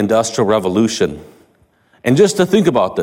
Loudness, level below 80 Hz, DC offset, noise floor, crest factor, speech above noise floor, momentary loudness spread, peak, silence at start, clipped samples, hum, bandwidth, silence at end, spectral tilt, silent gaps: -14 LUFS; -48 dBFS; under 0.1%; -55 dBFS; 14 dB; 41 dB; 8 LU; -2 dBFS; 0 s; under 0.1%; none; 16.5 kHz; 0 s; -5 dB/octave; none